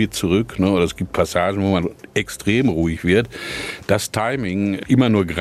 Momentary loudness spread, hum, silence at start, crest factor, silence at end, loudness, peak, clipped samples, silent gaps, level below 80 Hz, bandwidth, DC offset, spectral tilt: 7 LU; none; 0 s; 16 dB; 0 s; -19 LUFS; -4 dBFS; under 0.1%; none; -42 dBFS; 14.5 kHz; under 0.1%; -5.5 dB/octave